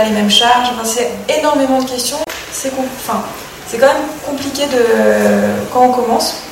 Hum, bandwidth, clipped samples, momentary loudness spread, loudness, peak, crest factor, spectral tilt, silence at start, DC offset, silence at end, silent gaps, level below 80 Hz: none; 16.5 kHz; under 0.1%; 11 LU; -13 LUFS; 0 dBFS; 14 dB; -3 dB/octave; 0 s; under 0.1%; 0 s; none; -46 dBFS